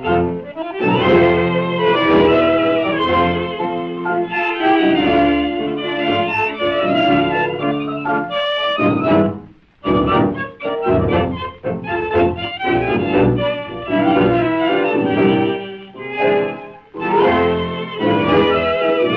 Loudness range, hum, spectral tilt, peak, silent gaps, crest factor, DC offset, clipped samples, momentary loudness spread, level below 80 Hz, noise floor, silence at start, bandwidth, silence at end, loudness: 3 LU; none; -8.5 dB/octave; -2 dBFS; none; 14 dB; under 0.1%; under 0.1%; 9 LU; -42 dBFS; -37 dBFS; 0 s; 6 kHz; 0 s; -17 LUFS